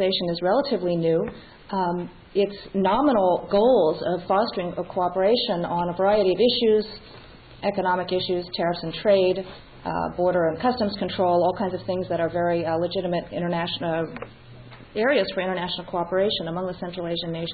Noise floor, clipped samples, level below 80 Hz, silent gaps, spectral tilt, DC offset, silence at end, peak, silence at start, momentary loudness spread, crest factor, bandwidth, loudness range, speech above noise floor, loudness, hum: -44 dBFS; under 0.1%; -52 dBFS; none; -10.5 dB/octave; under 0.1%; 0 s; -8 dBFS; 0 s; 10 LU; 16 dB; 4.8 kHz; 4 LU; 21 dB; -24 LUFS; none